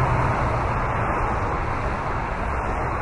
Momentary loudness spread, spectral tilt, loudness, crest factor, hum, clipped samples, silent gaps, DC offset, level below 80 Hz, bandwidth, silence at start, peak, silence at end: 4 LU; -7.5 dB/octave; -24 LUFS; 14 dB; none; under 0.1%; none; under 0.1%; -30 dBFS; 11 kHz; 0 s; -8 dBFS; 0 s